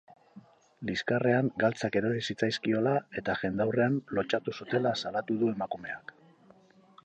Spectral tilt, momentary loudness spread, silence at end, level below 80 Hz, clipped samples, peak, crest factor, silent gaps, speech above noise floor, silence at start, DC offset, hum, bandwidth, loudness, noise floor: -6 dB/octave; 9 LU; 1.05 s; -66 dBFS; under 0.1%; -12 dBFS; 18 dB; none; 30 dB; 0.35 s; under 0.1%; none; 9.2 kHz; -30 LUFS; -60 dBFS